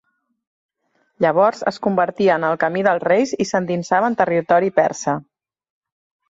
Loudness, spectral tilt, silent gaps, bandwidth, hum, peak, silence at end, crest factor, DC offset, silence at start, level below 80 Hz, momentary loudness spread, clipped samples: -18 LUFS; -5.5 dB/octave; none; 8 kHz; none; -2 dBFS; 1.1 s; 16 dB; under 0.1%; 1.2 s; -62 dBFS; 5 LU; under 0.1%